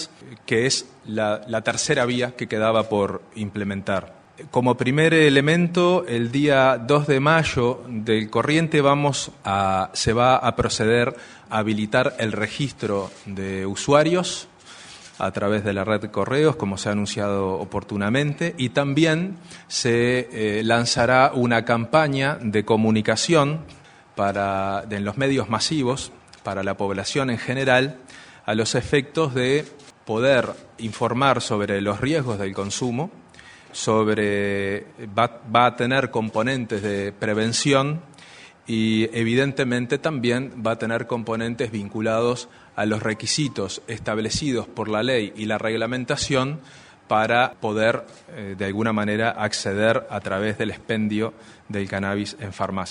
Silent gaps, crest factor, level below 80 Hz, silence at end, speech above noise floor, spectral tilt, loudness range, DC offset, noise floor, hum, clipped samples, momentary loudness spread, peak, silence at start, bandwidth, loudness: none; 22 dB; -52 dBFS; 0 s; 25 dB; -5 dB/octave; 5 LU; under 0.1%; -47 dBFS; none; under 0.1%; 11 LU; 0 dBFS; 0 s; 10.5 kHz; -22 LUFS